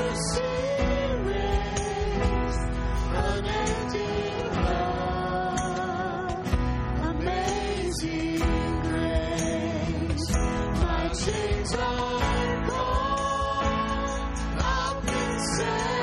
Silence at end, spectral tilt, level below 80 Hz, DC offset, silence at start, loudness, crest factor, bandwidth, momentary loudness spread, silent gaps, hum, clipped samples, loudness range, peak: 0 s; -5 dB/octave; -32 dBFS; under 0.1%; 0 s; -27 LUFS; 16 dB; 11.5 kHz; 3 LU; none; none; under 0.1%; 1 LU; -12 dBFS